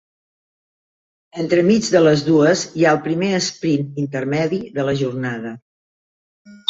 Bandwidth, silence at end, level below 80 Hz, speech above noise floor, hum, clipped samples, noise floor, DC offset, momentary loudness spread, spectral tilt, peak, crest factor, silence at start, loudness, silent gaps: 8 kHz; 0.15 s; -58 dBFS; over 73 dB; none; under 0.1%; under -90 dBFS; under 0.1%; 11 LU; -5.5 dB/octave; -2 dBFS; 18 dB; 1.35 s; -18 LUFS; 5.62-6.45 s